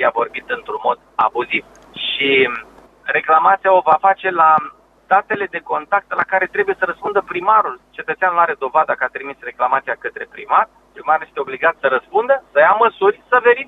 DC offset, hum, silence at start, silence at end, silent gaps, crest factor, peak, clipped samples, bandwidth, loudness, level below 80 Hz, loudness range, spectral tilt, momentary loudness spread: under 0.1%; none; 0 s; 0.05 s; none; 16 dB; 0 dBFS; under 0.1%; 6.8 kHz; -16 LUFS; -60 dBFS; 4 LU; -5.5 dB/octave; 12 LU